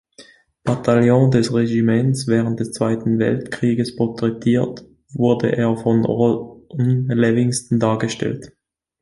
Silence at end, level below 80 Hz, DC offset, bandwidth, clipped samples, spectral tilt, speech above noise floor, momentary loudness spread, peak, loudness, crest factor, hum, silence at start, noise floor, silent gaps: 0.55 s; -52 dBFS; under 0.1%; 11.5 kHz; under 0.1%; -7 dB/octave; 30 dB; 9 LU; -2 dBFS; -18 LUFS; 16 dB; none; 0.2 s; -48 dBFS; none